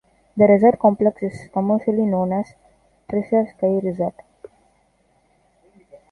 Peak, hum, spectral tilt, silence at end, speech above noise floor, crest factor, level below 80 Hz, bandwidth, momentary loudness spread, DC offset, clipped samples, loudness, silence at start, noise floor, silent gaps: -2 dBFS; none; -10 dB/octave; 2 s; 44 dB; 18 dB; -58 dBFS; 9.2 kHz; 13 LU; under 0.1%; under 0.1%; -19 LUFS; 0.35 s; -62 dBFS; none